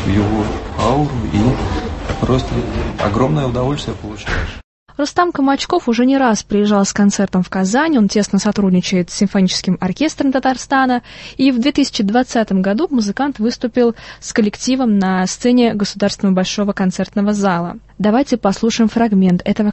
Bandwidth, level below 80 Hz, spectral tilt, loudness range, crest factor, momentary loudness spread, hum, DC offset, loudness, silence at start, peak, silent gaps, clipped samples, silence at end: 8.6 kHz; -32 dBFS; -5.5 dB/octave; 3 LU; 14 dB; 7 LU; none; under 0.1%; -16 LUFS; 0 s; 0 dBFS; 4.64-4.86 s; under 0.1%; 0 s